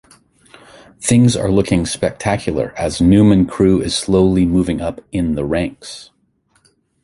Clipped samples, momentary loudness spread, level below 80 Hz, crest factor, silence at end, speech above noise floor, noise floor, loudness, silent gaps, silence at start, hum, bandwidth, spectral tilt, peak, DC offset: under 0.1%; 11 LU; -34 dBFS; 14 dB; 1 s; 45 dB; -60 dBFS; -15 LUFS; none; 1 s; none; 11.5 kHz; -6 dB/octave; -2 dBFS; under 0.1%